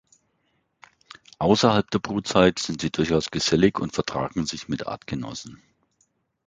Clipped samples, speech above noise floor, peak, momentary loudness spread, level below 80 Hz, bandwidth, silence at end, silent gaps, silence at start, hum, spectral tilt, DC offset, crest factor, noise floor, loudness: under 0.1%; 48 dB; -2 dBFS; 12 LU; -50 dBFS; 9.4 kHz; 0.9 s; none; 1.4 s; none; -5 dB/octave; under 0.1%; 22 dB; -71 dBFS; -23 LUFS